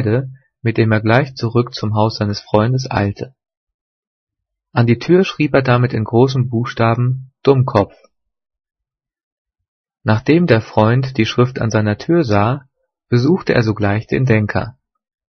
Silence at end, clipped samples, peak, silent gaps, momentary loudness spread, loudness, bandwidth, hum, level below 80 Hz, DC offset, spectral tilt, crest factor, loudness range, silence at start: 0.6 s; under 0.1%; 0 dBFS; 3.57-3.67 s, 3.74-4.27 s, 9.23-9.45 s, 9.68-9.84 s; 8 LU; -16 LUFS; 6.6 kHz; none; -48 dBFS; under 0.1%; -7.5 dB/octave; 16 dB; 4 LU; 0 s